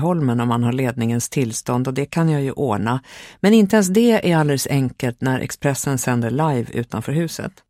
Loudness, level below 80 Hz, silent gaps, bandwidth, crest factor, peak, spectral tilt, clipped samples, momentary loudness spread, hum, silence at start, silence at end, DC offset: -19 LUFS; -52 dBFS; none; 16 kHz; 16 dB; -2 dBFS; -6 dB/octave; under 0.1%; 8 LU; none; 0 s; 0.2 s; under 0.1%